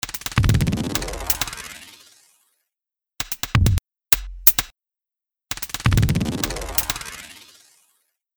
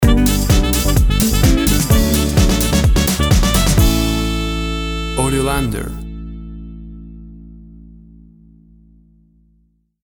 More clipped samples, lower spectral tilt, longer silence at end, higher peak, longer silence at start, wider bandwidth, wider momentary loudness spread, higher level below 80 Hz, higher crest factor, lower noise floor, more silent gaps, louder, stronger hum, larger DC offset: neither; about the same, -4 dB/octave vs -5 dB/octave; second, 1 s vs 2.2 s; about the same, 0 dBFS vs 0 dBFS; about the same, 0.05 s vs 0 s; about the same, over 20 kHz vs over 20 kHz; about the same, 19 LU vs 19 LU; second, -32 dBFS vs -20 dBFS; first, 24 dB vs 16 dB; first, -89 dBFS vs -58 dBFS; neither; second, -21 LUFS vs -15 LUFS; neither; neither